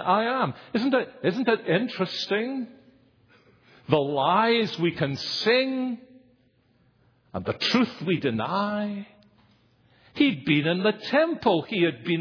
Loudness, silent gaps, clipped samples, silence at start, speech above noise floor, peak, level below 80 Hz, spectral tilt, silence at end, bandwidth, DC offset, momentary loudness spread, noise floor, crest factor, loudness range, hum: -25 LUFS; none; under 0.1%; 0 s; 39 dB; -2 dBFS; -66 dBFS; -6 dB/octave; 0 s; 5.4 kHz; under 0.1%; 10 LU; -64 dBFS; 24 dB; 3 LU; none